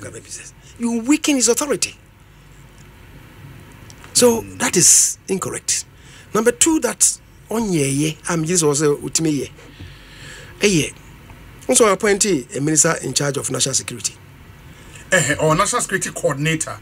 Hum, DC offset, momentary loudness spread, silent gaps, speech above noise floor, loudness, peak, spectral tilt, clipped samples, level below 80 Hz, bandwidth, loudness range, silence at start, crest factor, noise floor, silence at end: none; under 0.1%; 12 LU; none; 27 dB; -17 LUFS; 0 dBFS; -3 dB/octave; under 0.1%; -48 dBFS; 16 kHz; 6 LU; 0 s; 20 dB; -45 dBFS; 0 s